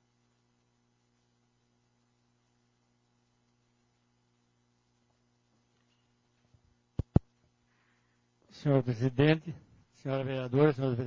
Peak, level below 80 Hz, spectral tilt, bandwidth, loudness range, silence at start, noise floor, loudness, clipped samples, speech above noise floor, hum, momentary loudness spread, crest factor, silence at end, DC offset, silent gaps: -6 dBFS; -52 dBFS; -8.5 dB/octave; 7 kHz; 9 LU; 7.15 s; -74 dBFS; -30 LUFS; under 0.1%; 45 dB; 60 Hz at -75 dBFS; 16 LU; 28 dB; 0 s; under 0.1%; none